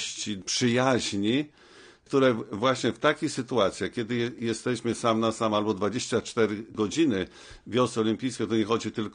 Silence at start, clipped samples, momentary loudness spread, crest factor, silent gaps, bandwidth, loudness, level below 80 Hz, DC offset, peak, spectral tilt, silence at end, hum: 0 s; under 0.1%; 6 LU; 18 dB; none; 10 kHz; -27 LUFS; -62 dBFS; under 0.1%; -8 dBFS; -4.5 dB/octave; 0.05 s; none